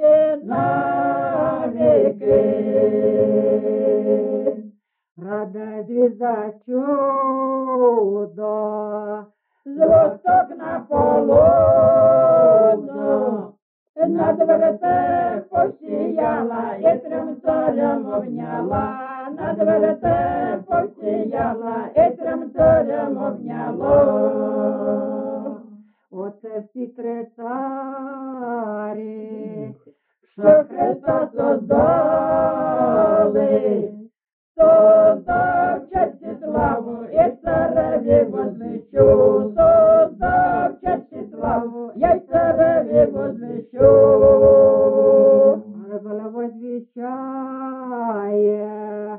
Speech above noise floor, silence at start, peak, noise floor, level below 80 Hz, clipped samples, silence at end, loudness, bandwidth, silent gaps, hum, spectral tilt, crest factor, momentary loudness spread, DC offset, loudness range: 38 dB; 0 s; -2 dBFS; -55 dBFS; -46 dBFS; under 0.1%; 0 s; -18 LUFS; 3.5 kHz; 5.11-5.16 s, 13.62-13.94 s, 34.33-34.55 s; none; -8.5 dB/octave; 16 dB; 17 LU; under 0.1%; 8 LU